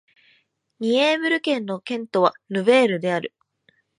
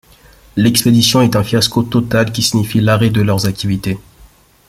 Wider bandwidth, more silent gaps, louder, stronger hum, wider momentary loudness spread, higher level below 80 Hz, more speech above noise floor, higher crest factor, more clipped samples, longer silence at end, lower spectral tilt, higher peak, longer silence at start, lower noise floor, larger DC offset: second, 10.5 kHz vs 16 kHz; neither; second, -21 LUFS vs -13 LUFS; neither; about the same, 11 LU vs 9 LU; second, -76 dBFS vs -42 dBFS; first, 43 dB vs 32 dB; first, 20 dB vs 14 dB; neither; about the same, 0.7 s vs 0.7 s; about the same, -5 dB/octave vs -5 dB/octave; about the same, -2 dBFS vs 0 dBFS; first, 0.8 s vs 0.55 s; first, -64 dBFS vs -45 dBFS; neither